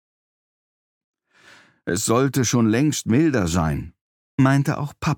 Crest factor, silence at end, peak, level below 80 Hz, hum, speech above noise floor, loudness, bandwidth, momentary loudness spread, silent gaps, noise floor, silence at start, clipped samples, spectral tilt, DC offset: 18 dB; 0 s; -4 dBFS; -44 dBFS; none; 33 dB; -20 LUFS; 18 kHz; 12 LU; 4.01-4.38 s; -52 dBFS; 1.85 s; under 0.1%; -5.5 dB/octave; under 0.1%